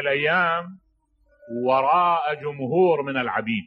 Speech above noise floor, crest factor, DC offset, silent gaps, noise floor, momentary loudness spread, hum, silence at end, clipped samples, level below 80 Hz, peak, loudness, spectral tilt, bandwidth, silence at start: 42 dB; 16 dB; under 0.1%; none; -63 dBFS; 9 LU; none; 0 s; under 0.1%; -68 dBFS; -6 dBFS; -22 LUFS; -8.5 dB/octave; 5.4 kHz; 0 s